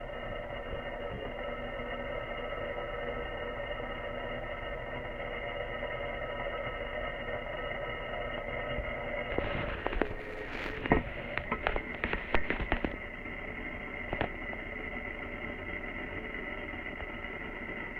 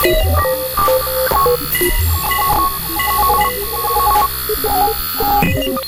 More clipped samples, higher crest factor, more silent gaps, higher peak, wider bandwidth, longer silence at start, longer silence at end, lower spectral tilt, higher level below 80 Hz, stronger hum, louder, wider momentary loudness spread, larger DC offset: neither; first, 26 dB vs 14 dB; neither; second, -10 dBFS vs 0 dBFS; second, 7 kHz vs 17.5 kHz; about the same, 0 s vs 0 s; about the same, 0 s vs 0 s; first, -7 dB/octave vs -3.5 dB/octave; second, -44 dBFS vs -26 dBFS; neither; second, -37 LUFS vs -14 LUFS; about the same, 6 LU vs 4 LU; neither